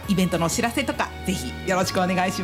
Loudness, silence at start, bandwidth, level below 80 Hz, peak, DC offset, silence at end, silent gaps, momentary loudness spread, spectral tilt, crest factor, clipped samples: -24 LUFS; 0 s; 16 kHz; -42 dBFS; -10 dBFS; under 0.1%; 0 s; none; 6 LU; -4.5 dB/octave; 14 dB; under 0.1%